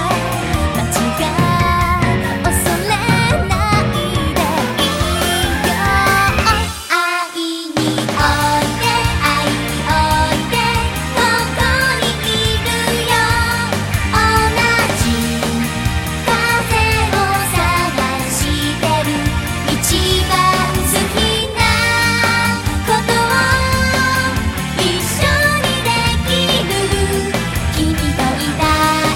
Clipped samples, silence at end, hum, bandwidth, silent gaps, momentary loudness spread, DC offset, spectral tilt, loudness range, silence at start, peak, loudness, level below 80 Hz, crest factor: under 0.1%; 0 s; none; 16.5 kHz; none; 5 LU; under 0.1%; -4 dB/octave; 2 LU; 0 s; 0 dBFS; -15 LUFS; -26 dBFS; 14 dB